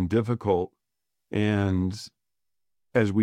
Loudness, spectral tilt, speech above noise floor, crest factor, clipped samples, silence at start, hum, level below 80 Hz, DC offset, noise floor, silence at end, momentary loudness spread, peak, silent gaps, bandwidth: -27 LUFS; -7.5 dB/octave; 64 dB; 18 dB; under 0.1%; 0 s; none; -56 dBFS; under 0.1%; -88 dBFS; 0 s; 12 LU; -8 dBFS; none; 11.5 kHz